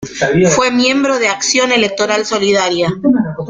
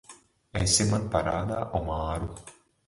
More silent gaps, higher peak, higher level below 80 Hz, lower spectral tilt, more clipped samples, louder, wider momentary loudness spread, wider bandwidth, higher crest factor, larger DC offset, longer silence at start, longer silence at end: neither; first, 0 dBFS vs -8 dBFS; second, -48 dBFS vs -42 dBFS; about the same, -3.5 dB/octave vs -4 dB/octave; neither; first, -12 LUFS vs -27 LUFS; second, 4 LU vs 14 LU; second, 9.6 kHz vs 11.5 kHz; second, 14 dB vs 20 dB; neither; about the same, 0 s vs 0.1 s; second, 0 s vs 0.35 s